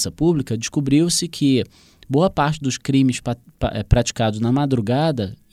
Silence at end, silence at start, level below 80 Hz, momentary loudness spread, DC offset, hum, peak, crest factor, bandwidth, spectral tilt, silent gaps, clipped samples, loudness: 0.15 s; 0 s; -36 dBFS; 8 LU; under 0.1%; none; 0 dBFS; 20 dB; 15 kHz; -5.5 dB/octave; none; under 0.1%; -20 LUFS